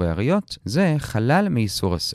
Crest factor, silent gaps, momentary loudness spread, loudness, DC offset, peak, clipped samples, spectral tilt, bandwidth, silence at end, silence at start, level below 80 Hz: 14 dB; none; 4 LU; -21 LUFS; under 0.1%; -6 dBFS; under 0.1%; -6 dB/octave; 15 kHz; 0 s; 0 s; -42 dBFS